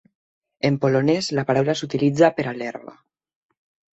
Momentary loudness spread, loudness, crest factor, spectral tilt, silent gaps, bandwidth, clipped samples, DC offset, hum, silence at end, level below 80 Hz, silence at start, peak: 12 LU; -21 LUFS; 20 dB; -6 dB/octave; none; 8.2 kHz; under 0.1%; under 0.1%; none; 1.05 s; -62 dBFS; 0.65 s; -2 dBFS